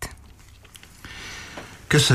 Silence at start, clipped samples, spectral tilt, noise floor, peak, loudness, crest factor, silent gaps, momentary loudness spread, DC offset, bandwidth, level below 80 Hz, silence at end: 0 s; under 0.1%; -4 dB/octave; -48 dBFS; -6 dBFS; -27 LUFS; 20 dB; none; 26 LU; under 0.1%; 15.5 kHz; -46 dBFS; 0 s